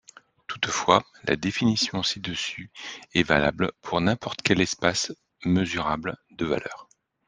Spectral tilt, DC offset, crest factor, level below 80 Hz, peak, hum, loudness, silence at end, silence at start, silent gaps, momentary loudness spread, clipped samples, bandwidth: -4 dB/octave; under 0.1%; 24 dB; -54 dBFS; -2 dBFS; none; -25 LUFS; 0.45 s; 0.5 s; none; 14 LU; under 0.1%; 10 kHz